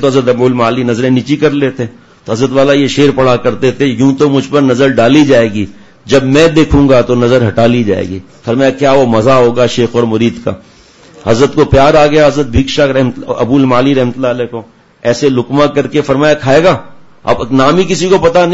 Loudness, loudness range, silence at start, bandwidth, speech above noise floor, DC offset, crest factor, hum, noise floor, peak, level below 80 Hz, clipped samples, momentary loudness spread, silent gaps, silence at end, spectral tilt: -9 LUFS; 3 LU; 0 s; 8 kHz; 29 dB; under 0.1%; 10 dB; none; -38 dBFS; 0 dBFS; -30 dBFS; 0.3%; 9 LU; none; 0 s; -6 dB/octave